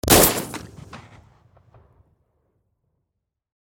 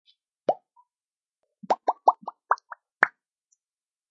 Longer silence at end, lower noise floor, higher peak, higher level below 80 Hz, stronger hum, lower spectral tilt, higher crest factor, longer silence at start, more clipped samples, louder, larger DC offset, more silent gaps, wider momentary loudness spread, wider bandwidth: first, 2.65 s vs 1.05 s; second, -80 dBFS vs under -90 dBFS; first, 0 dBFS vs -4 dBFS; first, -40 dBFS vs -90 dBFS; neither; first, -3 dB/octave vs -1 dB/octave; about the same, 24 dB vs 26 dB; second, 0.05 s vs 0.5 s; neither; first, -16 LUFS vs -27 LUFS; neither; neither; first, 29 LU vs 11 LU; first, 19.5 kHz vs 7.4 kHz